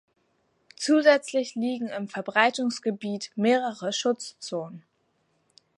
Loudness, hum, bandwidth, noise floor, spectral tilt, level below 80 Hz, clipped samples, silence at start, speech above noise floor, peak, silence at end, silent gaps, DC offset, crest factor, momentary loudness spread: -26 LUFS; none; 11.5 kHz; -71 dBFS; -4 dB/octave; -82 dBFS; under 0.1%; 0.8 s; 46 dB; -4 dBFS; 1 s; none; under 0.1%; 22 dB; 13 LU